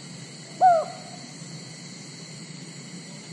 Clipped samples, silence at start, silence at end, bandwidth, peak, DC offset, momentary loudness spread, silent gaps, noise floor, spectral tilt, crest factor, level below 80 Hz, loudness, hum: under 0.1%; 0 s; 0 s; 11.5 kHz; -8 dBFS; under 0.1%; 20 LU; none; -41 dBFS; -4 dB/octave; 20 dB; -84 dBFS; -22 LUFS; none